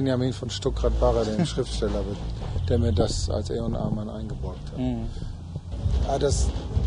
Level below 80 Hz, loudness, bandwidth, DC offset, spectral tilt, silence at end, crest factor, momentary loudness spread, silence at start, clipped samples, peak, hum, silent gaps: -30 dBFS; -27 LUFS; 10.5 kHz; under 0.1%; -6 dB/octave; 0 s; 16 dB; 11 LU; 0 s; under 0.1%; -8 dBFS; none; none